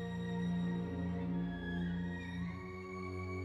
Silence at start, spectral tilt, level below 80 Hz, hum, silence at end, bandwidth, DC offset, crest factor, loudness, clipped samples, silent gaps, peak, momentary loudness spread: 0 s; -8 dB/octave; -56 dBFS; 60 Hz at -70 dBFS; 0 s; 7.8 kHz; under 0.1%; 10 dB; -40 LUFS; under 0.1%; none; -28 dBFS; 6 LU